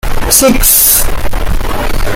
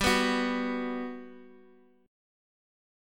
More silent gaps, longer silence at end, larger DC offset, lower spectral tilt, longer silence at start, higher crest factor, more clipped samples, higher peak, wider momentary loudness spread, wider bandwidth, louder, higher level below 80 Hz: neither; second, 0 s vs 1.55 s; neither; about the same, -2.5 dB/octave vs -3.5 dB/octave; about the same, 0.05 s vs 0 s; second, 8 dB vs 22 dB; first, 0.9% vs under 0.1%; first, 0 dBFS vs -12 dBFS; second, 13 LU vs 19 LU; first, over 20 kHz vs 17.5 kHz; first, -8 LUFS vs -30 LUFS; first, -14 dBFS vs -52 dBFS